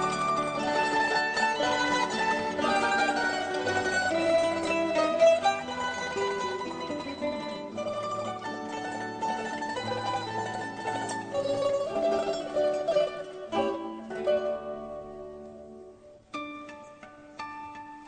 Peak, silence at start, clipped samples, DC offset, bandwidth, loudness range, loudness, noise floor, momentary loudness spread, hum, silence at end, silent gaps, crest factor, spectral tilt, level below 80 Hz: -12 dBFS; 0 s; under 0.1%; under 0.1%; 9.4 kHz; 8 LU; -29 LUFS; -51 dBFS; 16 LU; none; 0 s; none; 18 dB; -3.5 dB/octave; -64 dBFS